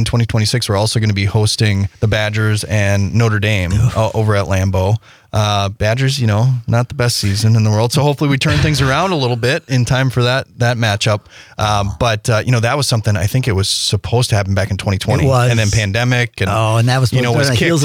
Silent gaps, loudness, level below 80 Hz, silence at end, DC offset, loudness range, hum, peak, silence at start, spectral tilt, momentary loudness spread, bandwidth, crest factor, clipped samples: none; -15 LUFS; -36 dBFS; 0 s; under 0.1%; 2 LU; none; -4 dBFS; 0 s; -5 dB/octave; 3 LU; 15.5 kHz; 10 dB; under 0.1%